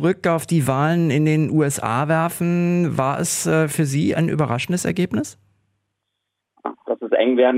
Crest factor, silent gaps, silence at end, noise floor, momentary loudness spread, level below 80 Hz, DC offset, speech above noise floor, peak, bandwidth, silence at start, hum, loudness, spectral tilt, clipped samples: 16 dB; none; 0 s; -78 dBFS; 8 LU; -58 dBFS; under 0.1%; 59 dB; -4 dBFS; 16 kHz; 0 s; none; -20 LUFS; -6 dB/octave; under 0.1%